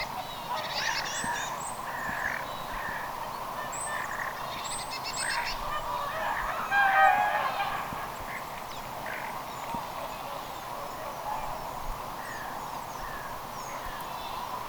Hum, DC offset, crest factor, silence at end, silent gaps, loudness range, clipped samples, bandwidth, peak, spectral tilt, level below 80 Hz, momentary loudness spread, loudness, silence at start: none; under 0.1%; 22 dB; 0 s; none; 9 LU; under 0.1%; over 20 kHz; -10 dBFS; -2 dB/octave; -50 dBFS; 10 LU; -32 LUFS; 0 s